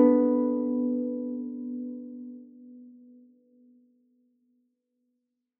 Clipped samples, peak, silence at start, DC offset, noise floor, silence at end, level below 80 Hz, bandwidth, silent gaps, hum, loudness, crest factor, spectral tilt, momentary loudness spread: under 0.1%; -8 dBFS; 0 s; under 0.1%; -80 dBFS; 2.7 s; -82 dBFS; 2.2 kHz; none; none; -28 LUFS; 22 dB; -10 dB/octave; 26 LU